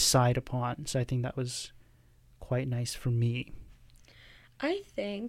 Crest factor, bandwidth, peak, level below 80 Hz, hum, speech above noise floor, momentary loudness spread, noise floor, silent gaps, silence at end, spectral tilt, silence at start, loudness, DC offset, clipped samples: 20 dB; 16 kHz; -12 dBFS; -52 dBFS; none; 30 dB; 9 LU; -61 dBFS; none; 0 s; -4.5 dB/octave; 0 s; -32 LUFS; under 0.1%; under 0.1%